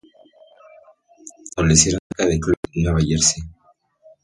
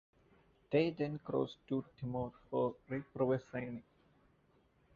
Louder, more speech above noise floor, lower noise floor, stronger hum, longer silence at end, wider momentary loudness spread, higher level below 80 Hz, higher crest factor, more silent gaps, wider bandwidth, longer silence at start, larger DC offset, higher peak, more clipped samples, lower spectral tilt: first, -18 LUFS vs -39 LUFS; first, 40 dB vs 34 dB; second, -58 dBFS vs -72 dBFS; neither; second, 0.7 s vs 1.15 s; first, 17 LU vs 10 LU; first, -34 dBFS vs -70 dBFS; about the same, 22 dB vs 20 dB; first, 1.99-2.10 s, 2.57-2.63 s vs none; first, 11.5 kHz vs 7.2 kHz; first, 1.25 s vs 0.7 s; neither; first, 0 dBFS vs -20 dBFS; neither; second, -4 dB/octave vs -6.5 dB/octave